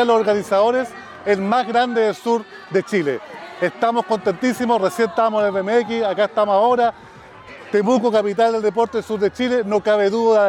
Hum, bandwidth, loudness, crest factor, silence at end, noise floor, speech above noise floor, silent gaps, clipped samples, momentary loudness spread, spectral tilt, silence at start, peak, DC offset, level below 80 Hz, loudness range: none; 15 kHz; -19 LUFS; 12 dB; 0 s; -40 dBFS; 22 dB; none; under 0.1%; 7 LU; -5.5 dB/octave; 0 s; -6 dBFS; under 0.1%; -62 dBFS; 2 LU